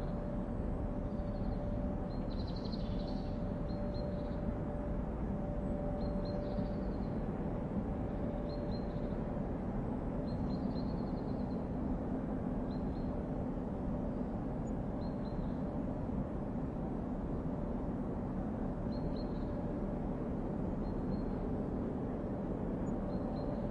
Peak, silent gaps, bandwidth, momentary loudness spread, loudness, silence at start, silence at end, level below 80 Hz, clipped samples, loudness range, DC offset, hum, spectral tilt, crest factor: -24 dBFS; none; 7.4 kHz; 2 LU; -39 LUFS; 0 s; 0 s; -44 dBFS; under 0.1%; 1 LU; under 0.1%; none; -9.5 dB/octave; 14 dB